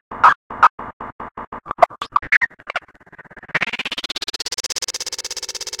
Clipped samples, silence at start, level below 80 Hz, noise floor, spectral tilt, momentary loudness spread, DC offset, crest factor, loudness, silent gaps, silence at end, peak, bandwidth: under 0.1%; 0.1 s; -52 dBFS; -45 dBFS; -0.5 dB/octave; 18 LU; under 0.1%; 22 dB; -19 LUFS; 0.36-0.50 s, 0.70-0.78 s, 0.93-1.00 s, 1.12-1.19 s, 1.31-1.35 s, 1.47-1.52 s, 2.37-2.41 s; 0.05 s; 0 dBFS; 17 kHz